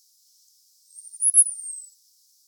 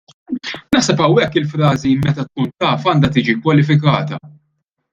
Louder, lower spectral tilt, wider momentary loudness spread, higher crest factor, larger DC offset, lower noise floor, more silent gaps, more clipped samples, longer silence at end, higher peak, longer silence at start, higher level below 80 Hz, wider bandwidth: second, -18 LUFS vs -15 LUFS; second, 10 dB/octave vs -6 dB/octave; first, 22 LU vs 12 LU; first, 22 dB vs 14 dB; neither; second, -61 dBFS vs -69 dBFS; neither; neither; about the same, 0.65 s vs 0.65 s; second, -4 dBFS vs 0 dBFS; first, 0.95 s vs 0.3 s; second, under -90 dBFS vs -48 dBFS; first, 19 kHz vs 7.8 kHz